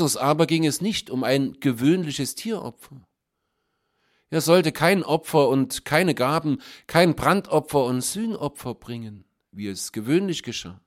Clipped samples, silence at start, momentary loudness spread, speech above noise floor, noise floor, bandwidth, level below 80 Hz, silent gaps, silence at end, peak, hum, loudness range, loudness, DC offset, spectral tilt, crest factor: under 0.1%; 0 s; 13 LU; 55 dB; -78 dBFS; 16.5 kHz; -56 dBFS; none; 0.1 s; -2 dBFS; none; 6 LU; -22 LUFS; under 0.1%; -5 dB/octave; 22 dB